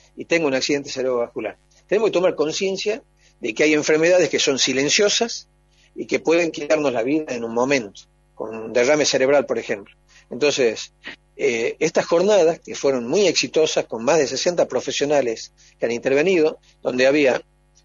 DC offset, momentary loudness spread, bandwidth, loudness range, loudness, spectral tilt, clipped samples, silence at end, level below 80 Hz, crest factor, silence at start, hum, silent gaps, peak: under 0.1%; 14 LU; 7.8 kHz; 3 LU; -20 LUFS; -3 dB/octave; under 0.1%; 0.45 s; -60 dBFS; 18 dB; 0.15 s; none; none; -4 dBFS